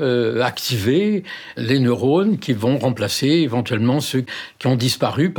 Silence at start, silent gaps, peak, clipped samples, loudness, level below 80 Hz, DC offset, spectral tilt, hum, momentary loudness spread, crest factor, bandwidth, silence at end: 0 s; none; -4 dBFS; under 0.1%; -19 LUFS; -62 dBFS; under 0.1%; -5.5 dB/octave; none; 7 LU; 14 dB; over 20 kHz; 0 s